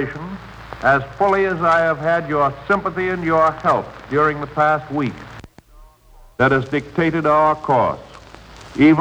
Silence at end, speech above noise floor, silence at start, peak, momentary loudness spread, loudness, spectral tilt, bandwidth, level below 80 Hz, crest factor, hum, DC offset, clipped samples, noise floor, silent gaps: 0 s; 29 dB; 0 s; -2 dBFS; 14 LU; -18 LUFS; -7.5 dB/octave; 9.2 kHz; -46 dBFS; 16 dB; none; under 0.1%; under 0.1%; -46 dBFS; none